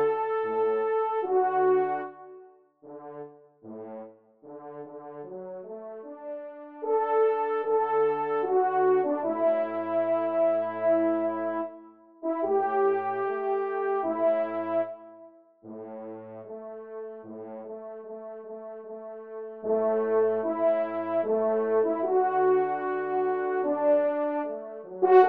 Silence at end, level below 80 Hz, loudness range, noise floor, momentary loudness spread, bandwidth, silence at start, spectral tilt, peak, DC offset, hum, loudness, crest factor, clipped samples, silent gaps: 0 s; -84 dBFS; 16 LU; -53 dBFS; 18 LU; 4.3 kHz; 0 s; -5 dB/octave; -6 dBFS; under 0.1%; none; -26 LUFS; 20 dB; under 0.1%; none